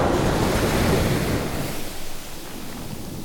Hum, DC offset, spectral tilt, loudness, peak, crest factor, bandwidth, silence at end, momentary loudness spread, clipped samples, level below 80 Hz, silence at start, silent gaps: none; under 0.1%; -5 dB/octave; -23 LUFS; -8 dBFS; 16 dB; 19 kHz; 0 s; 14 LU; under 0.1%; -32 dBFS; 0 s; none